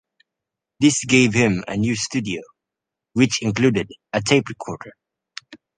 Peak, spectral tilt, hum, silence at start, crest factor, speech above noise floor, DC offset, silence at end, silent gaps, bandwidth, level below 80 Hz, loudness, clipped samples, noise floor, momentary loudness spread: -2 dBFS; -4.5 dB/octave; none; 0.8 s; 20 dB; 66 dB; under 0.1%; 0.2 s; none; 10 kHz; -52 dBFS; -19 LUFS; under 0.1%; -85 dBFS; 19 LU